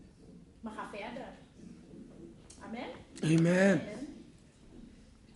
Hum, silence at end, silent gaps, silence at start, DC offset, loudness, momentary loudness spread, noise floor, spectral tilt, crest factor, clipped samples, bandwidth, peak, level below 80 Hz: none; 0.45 s; none; 0 s; under 0.1%; -32 LUFS; 26 LU; -57 dBFS; -6.5 dB/octave; 22 dB; under 0.1%; 11.5 kHz; -14 dBFS; -62 dBFS